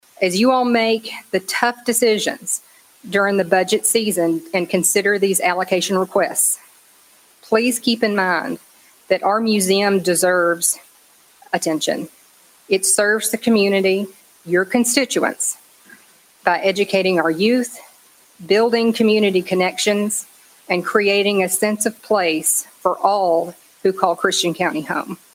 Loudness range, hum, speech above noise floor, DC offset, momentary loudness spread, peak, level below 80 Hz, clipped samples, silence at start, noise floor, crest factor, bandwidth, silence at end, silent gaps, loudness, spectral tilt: 2 LU; none; 34 dB; under 0.1%; 8 LU; 0 dBFS; -64 dBFS; under 0.1%; 0.2 s; -52 dBFS; 18 dB; 16.5 kHz; 0.2 s; none; -18 LUFS; -3 dB/octave